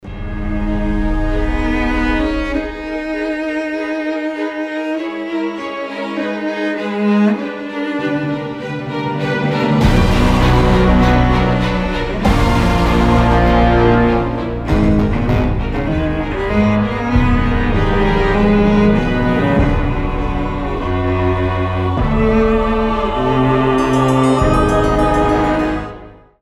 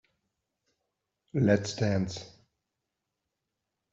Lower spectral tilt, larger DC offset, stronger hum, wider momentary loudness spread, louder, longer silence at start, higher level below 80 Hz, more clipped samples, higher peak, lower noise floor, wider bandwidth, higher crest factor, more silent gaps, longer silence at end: first, -7.5 dB/octave vs -6 dB/octave; neither; neither; about the same, 9 LU vs 11 LU; first, -16 LUFS vs -29 LUFS; second, 0.05 s vs 1.35 s; first, -22 dBFS vs -66 dBFS; neither; first, 0 dBFS vs -12 dBFS; second, -36 dBFS vs -85 dBFS; first, 12 kHz vs 8 kHz; second, 14 dB vs 22 dB; neither; second, 0.3 s vs 1.65 s